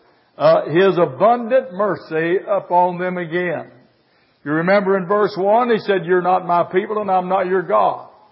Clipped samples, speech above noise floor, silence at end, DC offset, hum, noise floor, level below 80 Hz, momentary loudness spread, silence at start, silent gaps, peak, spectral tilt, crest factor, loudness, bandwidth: under 0.1%; 41 dB; 0.3 s; under 0.1%; none; -58 dBFS; -72 dBFS; 7 LU; 0.4 s; none; -2 dBFS; -11.5 dB/octave; 16 dB; -17 LUFS; 5.8 kHz